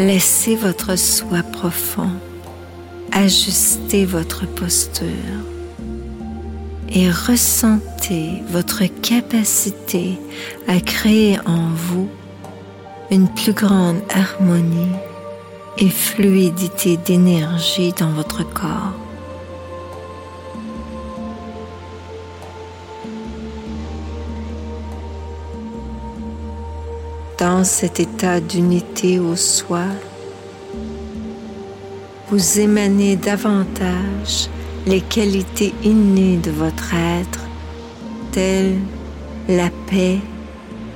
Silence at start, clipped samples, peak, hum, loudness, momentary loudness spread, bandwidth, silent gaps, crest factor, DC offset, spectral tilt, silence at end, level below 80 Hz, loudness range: 0 s; under 0.1%; -2 dBFS; none; -17 LUFS; 19 LU; 17 kHz; none; 16 dB; under 0.1%; -4.5 dB/octave; 0 s; -36 dBFS; 13 LU